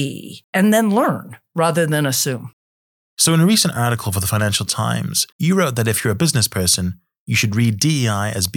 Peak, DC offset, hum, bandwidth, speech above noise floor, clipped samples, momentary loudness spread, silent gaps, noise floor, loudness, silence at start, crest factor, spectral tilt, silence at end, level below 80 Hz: -4 dBFS; under 0.1%; none; 19 kHz; over 72 dB; under 0.1%; 9 LU; 0.44-0.53 s, 2.53-3.17 s, 5.32-5.39 s, 7.18-7.26 s; under -90 dBFS; -17 LUFS; 0 s; 14 dB; -4 dB/octave; 0 s; -50 dBFS